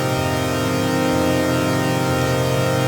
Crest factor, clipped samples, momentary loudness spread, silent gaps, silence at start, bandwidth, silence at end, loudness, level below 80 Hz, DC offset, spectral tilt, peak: 14 dB; under 0.1%; 2 LU; none; 0 s; over 20 kHz; 0 s; -19 LUFS; -46 dBFS; under 0.1%; -5.5 dB/octave; -4 dBFS